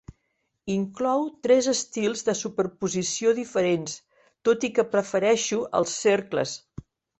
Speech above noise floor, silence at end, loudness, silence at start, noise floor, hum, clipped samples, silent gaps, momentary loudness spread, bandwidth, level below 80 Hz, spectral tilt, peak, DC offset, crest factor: 52 dB; 0.6 s; -25 LUFS; 0.65 s; -76 dBFS; none; under 0.1%; none; 7 LU; 8.4 kHz; -62 dBFS; -4 dB/octave; -8 dBFS; under 0.1%; 18 dB